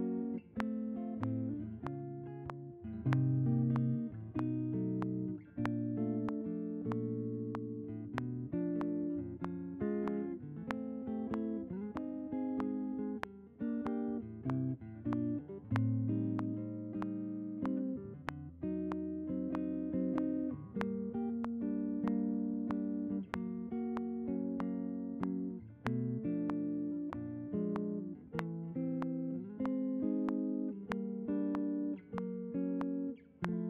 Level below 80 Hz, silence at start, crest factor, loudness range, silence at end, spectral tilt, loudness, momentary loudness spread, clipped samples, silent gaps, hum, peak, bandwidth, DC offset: -66 dBFS; 0 s; 22 dB; 3 LU; 0 s; -9 dB/octave; -39 LUFS; 7 LU; under 0.1%; none; none; -16 dBFS; 4.9 kHz; under 0.1%